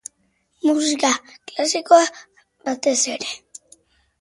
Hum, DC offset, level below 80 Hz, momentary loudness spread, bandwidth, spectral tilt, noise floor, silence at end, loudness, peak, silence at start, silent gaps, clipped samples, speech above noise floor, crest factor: none; under 0.1%; -70 dBFS; 17 LU; 11.5 kHz; -0.5 dB/octave; -66 dBFS; 0.85 s; -19 LUFS; -2 dBFS; 0.65 s; none; under 0.1%; 47 dB; 20 dB